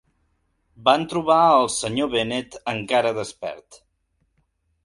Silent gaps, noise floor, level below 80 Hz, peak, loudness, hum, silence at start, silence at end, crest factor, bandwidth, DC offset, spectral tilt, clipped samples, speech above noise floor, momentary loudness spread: none; -70 dBFS; -58 dBFS; 0 dBFS; -21 LUFS; none; 0.8 s; 1.1 s; 22 dB; 11.5 kHz; under 0.1%; -4 dB/octave; under 0.1%; 49 dB; 15 LU